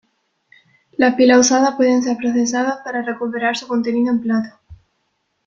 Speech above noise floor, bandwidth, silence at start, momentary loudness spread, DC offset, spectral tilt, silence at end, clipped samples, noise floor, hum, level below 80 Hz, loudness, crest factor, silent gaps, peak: 53 dB; 7.6 kHz; 1 s; 12 LU; under 0.1%; -3 dB/octave; 0.75 s; under 0.1%; -69 dBFS; none; -58 dBFS; -17 LUFS; 16 dB; none; -2 dBFS